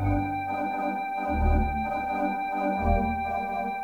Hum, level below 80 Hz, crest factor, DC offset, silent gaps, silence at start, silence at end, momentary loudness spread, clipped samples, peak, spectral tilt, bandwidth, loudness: none; -34 dBFS; 14 dB; under 0.1%; none; 0 s; 0 s; 4 LU; under 0.1%; -12 dBFS; -8.5 dB/octave; 17.5 kHz; -28 LUFS